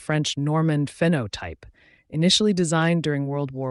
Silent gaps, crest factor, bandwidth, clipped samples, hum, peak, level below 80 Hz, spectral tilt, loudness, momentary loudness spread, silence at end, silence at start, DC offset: none; 14 dB; 11.5 kHz; under 0.1%; none; -8 dBFS; -54 dBFS; -5 dB/octave; -22 LUFS; 13 LU; 0 s; 0 s; under 0.1%